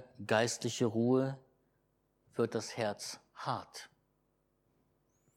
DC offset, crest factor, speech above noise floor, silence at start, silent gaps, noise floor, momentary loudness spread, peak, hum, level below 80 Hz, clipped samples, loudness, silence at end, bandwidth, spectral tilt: under 0.1%; 22 dB; 43 dB; 0 s; none; -77 dBFS; 14 LU; -14 dBFS; none; -80 dBFS; under 0.1%; -35 LUFS; 1.5 s; 16 kHz; -5 dB/octave